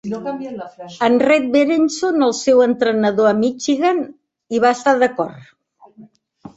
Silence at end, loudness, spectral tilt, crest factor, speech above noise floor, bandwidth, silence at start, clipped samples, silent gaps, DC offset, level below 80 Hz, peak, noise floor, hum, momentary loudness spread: 0.1 s; -16 LUFS; -4.5 dB/octave; 16 dB; 30 dB; 8.2 kHz; 0.05 s; under 0.1%; none; under 0.1%; -62 dBFS; -2 dBFS; -46 dBFS; none; 13 LU